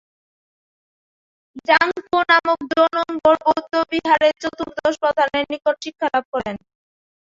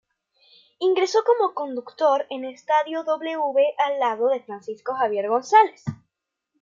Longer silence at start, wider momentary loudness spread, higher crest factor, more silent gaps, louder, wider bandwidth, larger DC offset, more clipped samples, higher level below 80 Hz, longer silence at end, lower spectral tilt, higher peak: first, 1.55 s vs 0.8 s; second, 11 LU vs 14 LU; about the same, 20 dB vs 18 dB; first, 6.25-6.33 s vs none; first, -18 LUFS vs -22 LUFS; about the same, 7.8 kHz vs 7.6 kHz; neither; neither; first, -58 dBFS vs -74 dBFS; about the same, 0.65 s vs 0.65 s; about the same, -4 dB/octave vs -4.5 dB/octave; first, 0 dBFS vs -6 dBFS